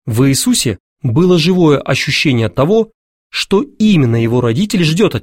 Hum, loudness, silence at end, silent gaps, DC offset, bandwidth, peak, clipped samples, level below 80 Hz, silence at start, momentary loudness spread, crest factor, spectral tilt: none; -13 LUFS; 0 s; 0.80-0.96 s, 2.94-3.30 s; 0.5%; 16.5 kHz; 0 dBFS; under 0.1%; -42 dBFS; 0.05 s; 7 LU; 12 dB; -5.5 dB/octave